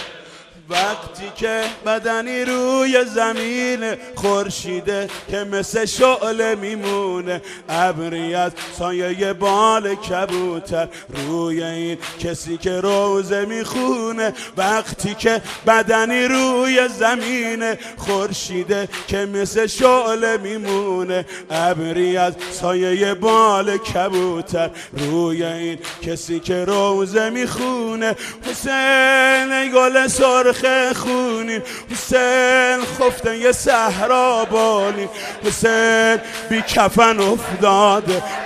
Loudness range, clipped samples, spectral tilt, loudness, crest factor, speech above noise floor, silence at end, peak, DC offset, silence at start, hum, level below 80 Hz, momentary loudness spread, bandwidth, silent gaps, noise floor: 5 LU; under 0.1%; -3.5 dB/octave; -18 LUFS; 18 dB; 23 dB; 0 s; 0 dBFS; under 0.1%; 0 s; none; -48 dBFS; 11 LU; 14 kHz; none; -41 dBFS